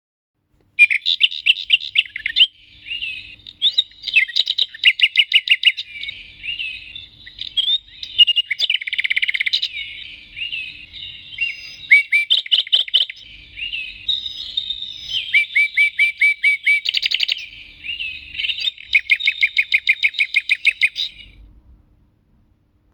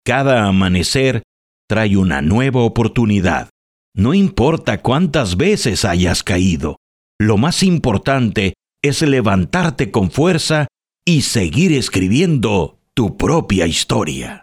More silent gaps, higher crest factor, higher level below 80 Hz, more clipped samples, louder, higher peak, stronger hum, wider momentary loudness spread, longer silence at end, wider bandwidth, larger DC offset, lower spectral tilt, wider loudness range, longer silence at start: second, none vs 1.24-1.68 s, 3.50-3.92 s, 6.77-7.19 s; about the same, 20 dB vs 16 dB; second, -56 dBFS vs -36 dBFS; neither; about the same, -16 LUFS vs -15 LUFS; about the same, 0 dBFS vs 0 dBFS; neither; first, 17 LU vs 6 LU; first, 1.7 s vs 0.05 s; first, over 20 kHz vs 14.5 kHz; neither; second, 2 dB/octave vs -5.5 dB/octave; about the same, 3 LU vs 1 LU; first, 0.8 s vs 0.05 s